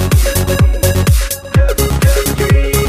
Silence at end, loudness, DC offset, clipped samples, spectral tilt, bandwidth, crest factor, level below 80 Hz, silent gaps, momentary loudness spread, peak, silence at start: 0 s; -13 LUFS; under 0.1%; under 0.1%; -5 dB/octave; 16 kHz; 10 dB; -14 dBFS; none; 2 LU; 0 dBFS; 0 s